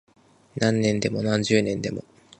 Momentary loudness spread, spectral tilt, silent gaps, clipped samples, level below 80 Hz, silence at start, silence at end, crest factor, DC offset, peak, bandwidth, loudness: 12 LU; -5.5 dB/octave; none; under 0.1%; -56 dBFS; 0.55 s; 0.4 s; 20 dB; under 0.1%; -6 dBFS; 9.2 kHz; -24 LUFS